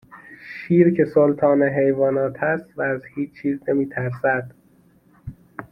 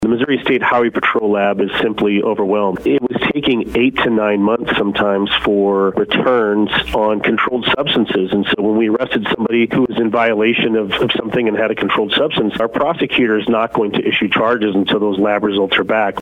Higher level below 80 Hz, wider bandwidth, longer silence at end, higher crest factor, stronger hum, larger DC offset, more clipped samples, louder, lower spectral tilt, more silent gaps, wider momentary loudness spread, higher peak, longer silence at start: second, -56 dBFS vs -44 dBFS; second, 5.6 kHz vs 10 kHz; about the same, 0.05 s vs 0 s; about the same, 18 dB vs 14 dB; neither; neither; neither; second, -20 LUFS vs -15 LUFS; first, -10.5 dB/octave vs -7 dB/octave; neither; first, 23 LU vs 3 LU; about the same, -4 dBFS vs -2 dBFS; first, 0.15 s vs 0 s